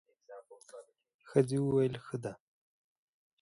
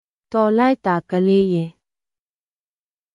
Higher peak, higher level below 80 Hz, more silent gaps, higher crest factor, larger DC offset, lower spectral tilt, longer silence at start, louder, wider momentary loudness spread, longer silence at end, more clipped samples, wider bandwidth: second, -14 dBFS vs -4 dBFS; second, -72 dBFS vs -60 dBFS; first, 1.14-1.19 s vs none; first, 24 dB vs 16 dB; neither; about the same, -7.5 dB/octave vs -8.5 dB/octave; about the same, 0.3 s vs 0.3 s; second, -33 LUFS vs -18 LUFS; first, 24 LU vs 8 LU; second, 1.05 s vs 1.45 s; neither; first, 11.5 kHz vs 9.8 kHz